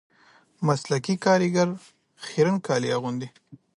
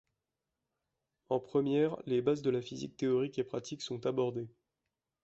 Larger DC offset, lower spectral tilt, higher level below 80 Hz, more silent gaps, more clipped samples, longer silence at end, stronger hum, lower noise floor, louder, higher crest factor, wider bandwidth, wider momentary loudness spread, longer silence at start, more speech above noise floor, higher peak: neither; about the same, -5.5 dB/octave vs -6.5 dB/octave; about the same, -70 dBFS vs -74 dBFS; neither; neither; second, 0.2 s vs 0.75 s; neither; second, -58 dBFS vs -89 dBFS; first, -24 LUFS vs -34 LUFS; about the same, 18 dB vs 18 dB; first, 11.5 kHz vs 8 kHz; first, 14 LU vs 9 LU; second, 0.6 s vs 1.3 s; second, 34 dB vs 55 dB; first, -8 dBFS vs -18 dBFS